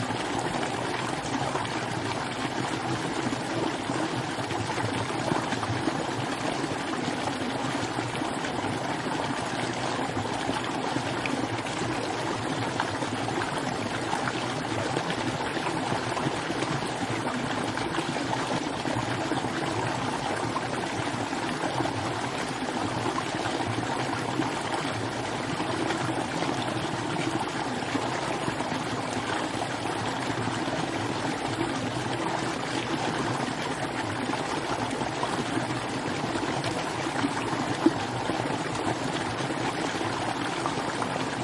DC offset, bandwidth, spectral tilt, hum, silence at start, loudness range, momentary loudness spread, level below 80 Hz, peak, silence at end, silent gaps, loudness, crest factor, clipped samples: under 0.1%; 11.5 kHz; -4.5 dB/octave; none; 0 s; 1 LU; 2 LU; -56 dBFS; -8 dBFS; 0 s; none; -29 LUFS; 22 dB; under 0.1%